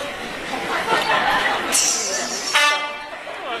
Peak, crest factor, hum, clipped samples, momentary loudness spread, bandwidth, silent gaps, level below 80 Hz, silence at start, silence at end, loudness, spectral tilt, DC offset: -4 dBFS; 18 dB; none; under 0.1%; 12 LU; 14 kHz; none; -52 dBFS; 0 s; 0 s; -19 LUFS; 0 dB/octave; under 0.1%